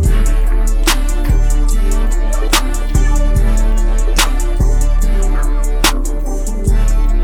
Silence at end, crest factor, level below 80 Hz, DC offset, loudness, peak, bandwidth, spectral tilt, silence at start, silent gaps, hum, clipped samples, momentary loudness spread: 0 s; 10 dB; -12 dBFS; under 0.1%; -16 LUFS; 0 dBFS; 16.5 kHz; -4 dB/octave; 0 s; none; none; under 0.1%; 4 LU